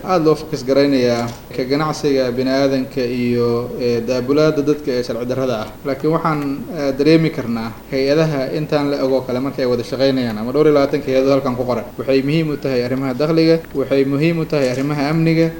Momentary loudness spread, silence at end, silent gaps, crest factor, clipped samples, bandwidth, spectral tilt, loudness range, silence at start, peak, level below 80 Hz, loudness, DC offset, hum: 7 LU; 0 s; none; 16 dB; under 0.1%; 17.5 kHz; -6.5 dB/octave; 2 LU; 0 s; 0 dBFS; -44 dBFS; -17 LUFS; under 0.1%; none